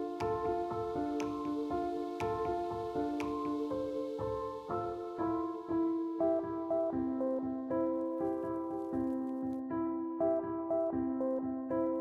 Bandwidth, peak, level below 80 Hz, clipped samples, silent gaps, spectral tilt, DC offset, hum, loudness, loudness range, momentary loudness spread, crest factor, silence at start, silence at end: 8.6 kHz; -22 dBFS; -62 dBFS; under 0.1%; none; -8 dB/octave; under 0.1%; none; -36 LUFS; 2 LU; 4 LU; 14 dB; 0 s; 0 s